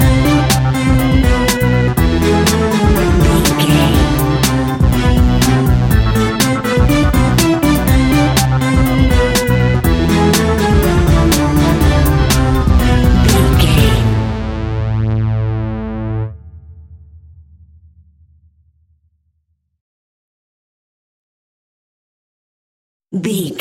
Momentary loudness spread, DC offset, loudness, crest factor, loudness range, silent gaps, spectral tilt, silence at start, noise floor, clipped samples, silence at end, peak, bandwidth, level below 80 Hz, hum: 8 LU; under 0.1%; -13 LUFS; 12 dB; 9 LU; 19.81-23.00 s; -5.5 dB/octave; 0 s; -65 dBFS; under 0.1%; 0 s; 0 dBFS; 17 kHz; -18 dBFS; none